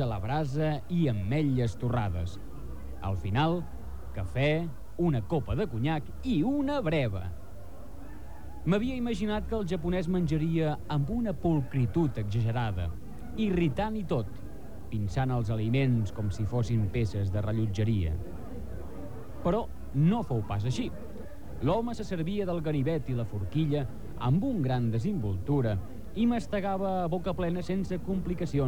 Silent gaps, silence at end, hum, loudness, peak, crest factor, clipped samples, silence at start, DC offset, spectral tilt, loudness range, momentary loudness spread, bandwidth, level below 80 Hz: none; 0 s; none; -30 LUFS; -14 dBFS; 16 dB; under 0.1%; 0 s; 1%; -8 dB/octave; 2 LU; 14 LU; 18.5 kHz; -44 dBFS